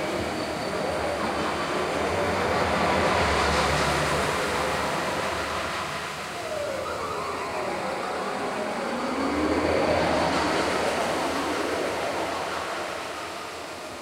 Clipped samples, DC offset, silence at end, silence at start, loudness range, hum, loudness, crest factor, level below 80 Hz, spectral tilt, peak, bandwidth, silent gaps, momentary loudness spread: under 0.1%; under 0.1%; 0 s; 0 s; 5 LU; none; -26 LUFS; 16 dB; -44 dBFS; -4 dB/octave; -10 dBFS; 16 kHz; none; 8 LU